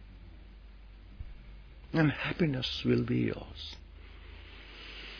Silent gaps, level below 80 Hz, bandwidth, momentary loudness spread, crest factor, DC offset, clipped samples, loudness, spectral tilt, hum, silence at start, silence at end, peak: none; -50 dBFS; 5.4 kHz; 25 LU; 20 dB; under 0.1%; under 0.1%; -32 LUFS; -7 dB/octave; none; 0 s; 0 s; -14 dBFS